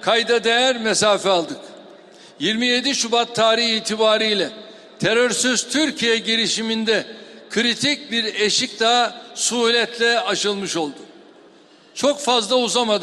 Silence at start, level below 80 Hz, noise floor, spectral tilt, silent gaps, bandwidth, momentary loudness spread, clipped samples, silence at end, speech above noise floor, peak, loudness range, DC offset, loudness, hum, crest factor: 0 s; -66 dBFS; -49 dBFS; -2 dB/octave; none; 13 kHz; 8 LU; under 0.1%; 0 s; 30 dB; -2 dBFS; 2 LU; under 0.1%; -18 LUFS; none; 18 dB